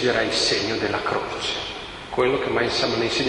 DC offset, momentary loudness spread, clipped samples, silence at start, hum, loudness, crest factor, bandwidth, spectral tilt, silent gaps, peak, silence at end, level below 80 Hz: under 0.1%; 9 LU; under 0.1%; 0 s; none; -22 LUFS; 18 dB; 11.5 kHz; -3.5 dB/octave; none; -6 dBFS; 0 s; -48 dBFS